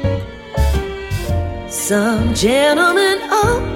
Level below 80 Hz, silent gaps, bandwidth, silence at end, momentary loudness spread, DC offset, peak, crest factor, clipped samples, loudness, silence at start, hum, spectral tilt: -26 dBFS; none; 16.5 kHz; 0 s; 11 LU; under 0.1%; -2 dBFS; 14 dB; under 0.1%; -16 LUFS; 0 s; none; -4.5 dB/octave